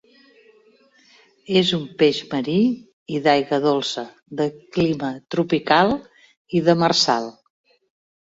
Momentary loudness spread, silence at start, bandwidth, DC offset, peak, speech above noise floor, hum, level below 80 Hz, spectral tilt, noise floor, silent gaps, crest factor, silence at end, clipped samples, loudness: 10 LU; 1.5 s; 8 kHz; under 0.1%; -2 dBFS; 36 dB; none; -58 dBFS; -5 dB/octave; -56 dBFS; 2.93-3.06 s, 6.37-6.45 s; 20 dB; 0.95 s; under 0.1%; -20 LUFS